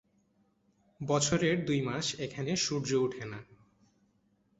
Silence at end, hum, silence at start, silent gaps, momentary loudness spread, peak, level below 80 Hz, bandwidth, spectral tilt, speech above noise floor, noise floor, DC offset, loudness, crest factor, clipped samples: 1.15 s; none; 1 s; none; 15 LU; -14 dBFS; -64 dBFS; 8.2 kHz; -4 dB/octave; 40 dB; -72 dBFS; under 0.1%; -31 LUFS; 20 dB; under 0.1%